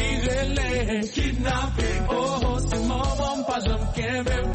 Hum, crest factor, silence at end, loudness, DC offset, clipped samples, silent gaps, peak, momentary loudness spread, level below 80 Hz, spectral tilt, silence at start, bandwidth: none; 12 dB; 0 s; -25 LUFS; 0.1%; under 0.1%; none; -12 dBFS; 2 LU; -28 dBFS; -5 dB/octave; 0 s; 8.8 kHz